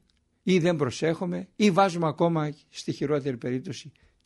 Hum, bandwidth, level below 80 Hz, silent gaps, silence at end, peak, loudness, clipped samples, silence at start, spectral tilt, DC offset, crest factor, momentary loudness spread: none; 11.5 kHz; -66 dBFS; none; 0.35 s; -8 dBFS; -26 LUFS; under 0.1%; 0.45 s; -6 dB/octave; under 0.1%; 18 dB; 12 LU